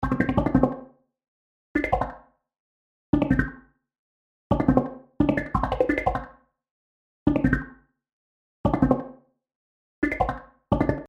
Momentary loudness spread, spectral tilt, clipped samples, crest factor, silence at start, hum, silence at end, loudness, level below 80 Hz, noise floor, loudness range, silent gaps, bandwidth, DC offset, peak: 12 LU; -9 dB/octave; under 0.1%; 22 dB; 0 s; none; 0 s; -25 LUFS; -38 dBFS; -49 dBFS; 4 LU; 1.28-1.75 s, 2.59-3.13 s, 3.99-4.50 s, 6.71-7.26 s, 8.13-8.64 s, 9.55-10.02 s; 7.6 kHz; under 0.1%; -4 dBFS